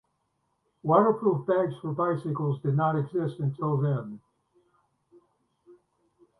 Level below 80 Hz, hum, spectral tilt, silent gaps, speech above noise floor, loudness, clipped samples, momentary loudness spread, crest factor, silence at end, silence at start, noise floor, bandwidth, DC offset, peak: -70 dBFS; none; -10.5 dB/octave; none; 49 dB; -27 LUFS; under 0.1%; 9 LU; 22 dB; 0.65 s; 0.85 s; -76 dBFS; 4.2 kHz; under 0.1%; -6 dBFS